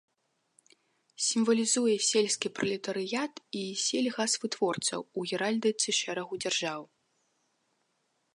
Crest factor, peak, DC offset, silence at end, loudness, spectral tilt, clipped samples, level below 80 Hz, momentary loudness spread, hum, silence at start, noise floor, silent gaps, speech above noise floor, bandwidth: 18 dB; -14 dBFS; under 0.1%; 1.5 s; -29 LUFS; -2.5 dB/octave; under 0.1%; -82 dBFS; 9 LU; none; 1.2 s; -77 dBFS; none; 46 dB; 11.5 kHz